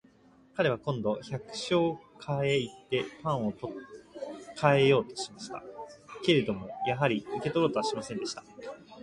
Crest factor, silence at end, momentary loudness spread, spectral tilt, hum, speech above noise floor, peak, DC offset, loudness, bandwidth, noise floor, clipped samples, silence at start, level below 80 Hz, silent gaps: 22 dB; 0 s; 17 LU; -5.5 dB/octave; none; 30 dB; -8 dBFS; under 0.1%; -30 LUFS; 11.5 kHz; -60 dBFS; under 0.1%; 0.55 s; -64 dBFS; none